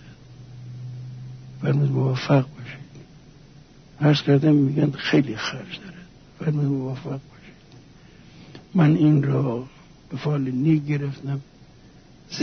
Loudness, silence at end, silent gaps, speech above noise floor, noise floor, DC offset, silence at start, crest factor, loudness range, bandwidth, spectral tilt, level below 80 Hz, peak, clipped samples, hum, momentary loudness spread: -22 LUFS; 0 s; none; 28 dB; -49 dBFS; under 0.1%; 0.05 s; 16 dB; 5 LU; 6.6 kHz; -7.5 dB/octave; -56 dBFS; -6 dBFS; under 0.1%; none; 21 LU